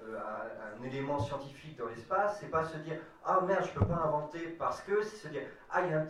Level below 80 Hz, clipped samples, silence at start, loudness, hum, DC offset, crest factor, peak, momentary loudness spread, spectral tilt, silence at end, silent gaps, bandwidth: -56 dBFS; under 0.1%; 0 s; -35 LUFS; none; under 0.1%; 18 dB; -16 dBFS; 11 LU; -7 dB/octave; 0 s; none; 12.5 kHz